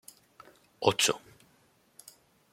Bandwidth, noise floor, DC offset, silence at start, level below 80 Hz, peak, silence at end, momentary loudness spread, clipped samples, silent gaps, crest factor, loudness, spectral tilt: 16.5 kHz; -66 dBFS; under 0.1%; 0.8 s; -74 dBFS; -6 dBFS; 1.35 s; 27 LU; under 0.1%; none; 28 dB; -28 LUFS; -2 dB/octave